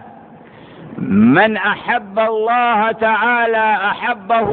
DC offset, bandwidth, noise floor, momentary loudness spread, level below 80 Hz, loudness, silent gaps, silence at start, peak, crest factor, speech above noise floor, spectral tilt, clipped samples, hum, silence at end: under 0.1%; 4.5 kHz; -39 dBFS; 7 LU; -54 dBFS; -15 LUFS; none; 0 s; -2 dBFS; 14 dB; 25 dB; -11 dB/octave; under 0.1%; none; 0 s